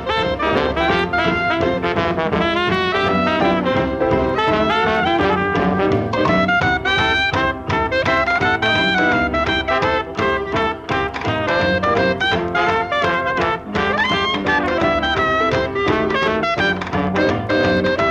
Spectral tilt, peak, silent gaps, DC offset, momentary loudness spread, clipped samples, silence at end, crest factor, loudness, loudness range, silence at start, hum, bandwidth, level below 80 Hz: -6 dB/octave; -4 dBFS; none; under 0.1%; 4 LU; under 0.1%; 0 s; 14 dB; -17 LUFS; 2 LU; 0 s; none; 10 kHz; -38 dBFS